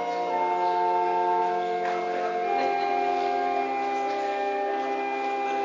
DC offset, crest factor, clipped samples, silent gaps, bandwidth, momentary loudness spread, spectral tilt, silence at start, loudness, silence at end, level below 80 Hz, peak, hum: under 0.1%; 12 dB; under 0.1%; none; 7.6 kHz; 4 LU; -4.5 dB/octave; 0 s; -26 LUFS; 0 s; -80 dBFS; -14 dBFS; none